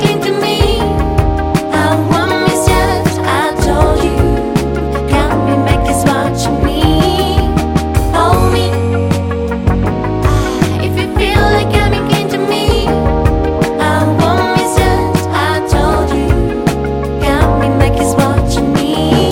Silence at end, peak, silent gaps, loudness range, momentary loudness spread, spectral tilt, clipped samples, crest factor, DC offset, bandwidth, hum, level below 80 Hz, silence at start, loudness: 0 s; 0 dBFS; none; 1 LU; 4 LU; -6 dB/octave; under 0.1%; 12 dB; under 0.1%; 17 kHz; none; -20 dBFS; 0 s; -12 LUFS